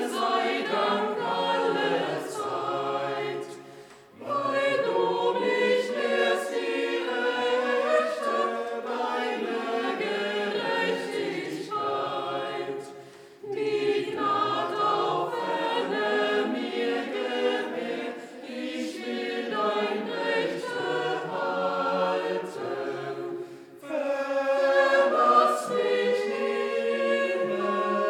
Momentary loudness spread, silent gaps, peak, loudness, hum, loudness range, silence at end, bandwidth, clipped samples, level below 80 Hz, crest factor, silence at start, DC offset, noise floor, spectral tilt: 9 LU; none; -8 dBFS; -27 LUFS; none; 6 LU; 0 s; 16 kHz; under 0.1%; -84 dBFS; 18 dB; 0 s; under 0.1%; -48 dBFS; -4 dB/octave